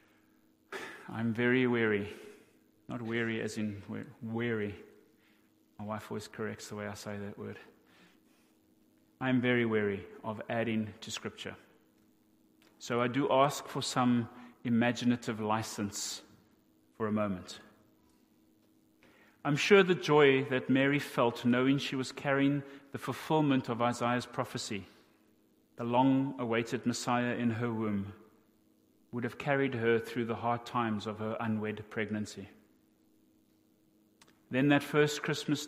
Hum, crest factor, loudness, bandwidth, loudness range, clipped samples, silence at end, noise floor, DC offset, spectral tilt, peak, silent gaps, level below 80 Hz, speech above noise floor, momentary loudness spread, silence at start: none; 24 dB; -32 LUFS; 15.5 kHz; 11 LU; under 0.1%; 0 s; -68 dBFS; under 0.1%; -5.5 dB/octave; -10 dBFS; none; -74 dBFS; 37 dB; 15 LU; 0.7 s